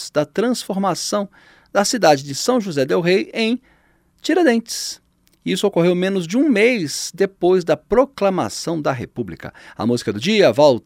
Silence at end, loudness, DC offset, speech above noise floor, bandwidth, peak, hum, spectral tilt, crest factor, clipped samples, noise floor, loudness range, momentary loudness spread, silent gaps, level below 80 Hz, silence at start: 0.05 s; -18 LUFS; under 0.1%; 40 dB; 16.5 kHz; 0 dBFS; none; -4.5 dB/octave; 18 dB; under 0.1%; -58 dBFS; 2 LU; 12 LU; none; -52 dBFS; 0 s